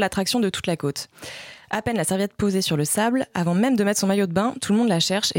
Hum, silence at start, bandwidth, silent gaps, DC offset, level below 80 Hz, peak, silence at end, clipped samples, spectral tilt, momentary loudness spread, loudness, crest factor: none; 0 s; 17 kHz; none; under 0.1%; -56 dBFS; -8 dBFS; 0 s; under 0.1%; -4.5 dB/octave; 10 LU; -22 LUFS; 14 dB